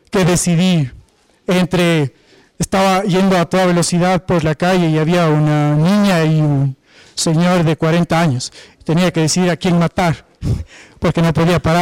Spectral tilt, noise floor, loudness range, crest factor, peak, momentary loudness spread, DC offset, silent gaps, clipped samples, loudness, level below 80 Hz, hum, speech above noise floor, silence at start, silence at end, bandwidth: -5.5 dB/octave; -47 dBFS; 2 LU; 6 dB; -8 dBFS; 9 LU; under 0.1%; none; under 0.1%; -15 LUFS; -38 dBFS; none; 33 dB; 0.15 s; 0 s; 15.5 kHz